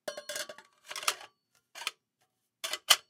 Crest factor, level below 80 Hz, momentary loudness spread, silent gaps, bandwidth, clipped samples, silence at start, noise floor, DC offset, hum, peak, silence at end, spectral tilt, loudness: 32 dB; -90 dBFS; 18 LU; none; 17.5 kHz; under 0.1%; 0.05 s; -78 dBFS; under 0.1%; none; -4 dBFS; 0.1 s; 2.5 dB/octave; -35 LUFS